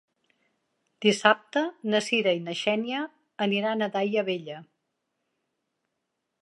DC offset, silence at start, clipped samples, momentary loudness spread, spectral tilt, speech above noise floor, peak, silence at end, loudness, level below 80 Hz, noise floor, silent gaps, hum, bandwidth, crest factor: under 0.1%; 1 s; under 0.1%; 11 LU; -4 dB/octave; 55 dB; -4 dBFS; 1.8 s; -26 LUFS; -82 dBFS; -81 dBFS; none; none; 11.5 kHz; 26 dB